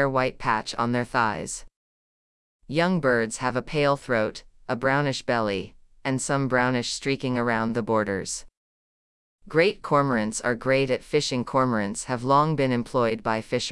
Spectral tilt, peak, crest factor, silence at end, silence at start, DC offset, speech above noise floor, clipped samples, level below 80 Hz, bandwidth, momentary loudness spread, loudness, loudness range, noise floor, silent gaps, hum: -5 dB/octave; -8 dBFS; 18 dB; 0 s; 0 s; under 0.1%; over 66 dB; under 0.1%; -54 dBFS; 12 kHz; 7 LU; -25 LUFS; 3 LU; under -90 dBFS; 1.76-2.59 s, 8.57-9.39 s; none